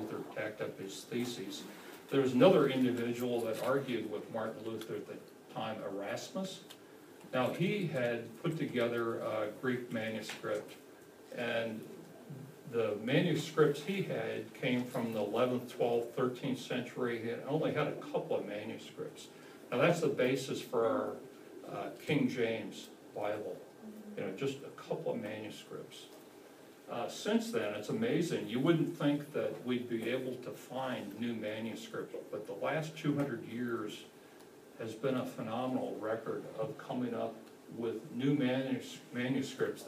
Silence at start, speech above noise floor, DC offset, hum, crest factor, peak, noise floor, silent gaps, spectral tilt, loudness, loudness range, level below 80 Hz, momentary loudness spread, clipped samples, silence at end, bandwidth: 0 s; 21 dB; under 0.1%; none; 24 dB; -12 dBFS; -56 dBFS; none; -6 dB/octave; -36 LUFS; 7 LU; -84 dBFS; 17 LU; under 0.1%; 0 s; 15.5 kHz